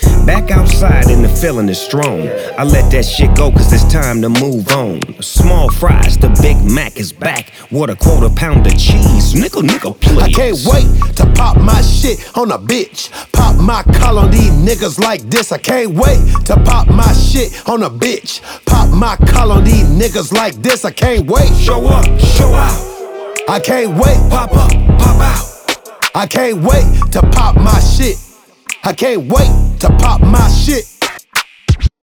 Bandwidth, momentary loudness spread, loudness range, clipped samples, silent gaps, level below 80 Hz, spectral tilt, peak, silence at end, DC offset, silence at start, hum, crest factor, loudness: 19.5 kHz; 8 LU; 1 LU; under 0.1%; none; -10 dBFS; -5.5 dB/octave; 0 dBFS; 0.15 s; under 0.1%; 0 s; none; 8 dB; -11 LUFS